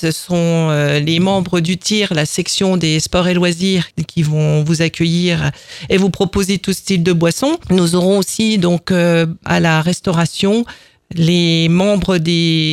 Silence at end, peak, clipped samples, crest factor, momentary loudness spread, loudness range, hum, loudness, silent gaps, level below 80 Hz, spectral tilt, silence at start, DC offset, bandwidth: 0 s; 0 dBFS; under 0.1%; 14 dB; 4 LU; 1 LU; none; -14 LUFS; none; -40 dBFS; -5 dB/octave; 0 s; under 0.1%; 14 kHz